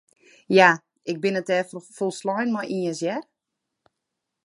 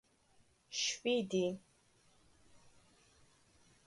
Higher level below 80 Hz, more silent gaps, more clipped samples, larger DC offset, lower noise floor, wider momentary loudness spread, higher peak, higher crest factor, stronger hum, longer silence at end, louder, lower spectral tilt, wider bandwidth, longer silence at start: about the same, -76 dBFS vs -78 dBFS; neither; neither; neither; first, -82 dBFS vs -71 dBFS; first, 13 LU vs 9 LU; first, -2 dBFS vs -24 dBFS; about the same, 24 dB vs 20 dB; neither; second, 1.25 s vs 2.3 s; first, -23 LUFS vs -37 LUFS; first, -5 dB/octave vs -3 dB/octave; about the same, 11.5 kHz vs 11.5 kHz; second, 0.5 s vs 0.7 s